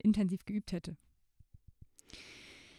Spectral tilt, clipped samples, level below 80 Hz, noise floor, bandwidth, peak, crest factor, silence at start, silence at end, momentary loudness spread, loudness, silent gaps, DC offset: -7 dB/octave; under 0.1%; -60 dBFS; -63 dBFS; 11 kHz; -20 dBFS; 18 dB; 0.05 s; 0.2 s; 21 LU; -36 LUFS; none; under 0.1%